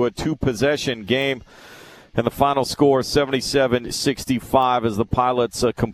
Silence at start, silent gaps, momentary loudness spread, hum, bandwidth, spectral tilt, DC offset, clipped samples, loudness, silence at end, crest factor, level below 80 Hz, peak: 0 s; none; 6 LU; none; 14 kHz; -5 dB/octave; under 0.1%; under 0.1%; -20 LUFS; 0 s; 18 dB; -42 dBFS; -2 dBFS